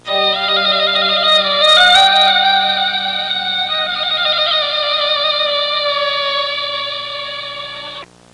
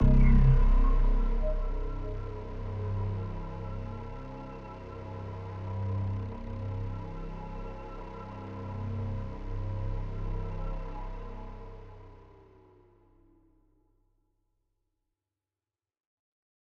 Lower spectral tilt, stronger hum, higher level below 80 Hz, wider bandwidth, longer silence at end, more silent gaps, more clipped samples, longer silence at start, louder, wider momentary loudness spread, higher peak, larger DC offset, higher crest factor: second, -1 dB/octave vs -9.5 dB/octave; first, 60 Hz at -50 dBFS vs none; second, -58 dBFS vs -32 dBFS; first, 11.5 kHz vs 4 kHz; second, 0.3 s vs 4.4 s; neither; neither; about the same, 0.05 s vs 0 s; first, -12 LUFS vs -34 LUFS; about the same, 15 LU vs 15 LU; first, 0 dBFS vs -10 dBFS; neither; second, 14 dB vs 20 dB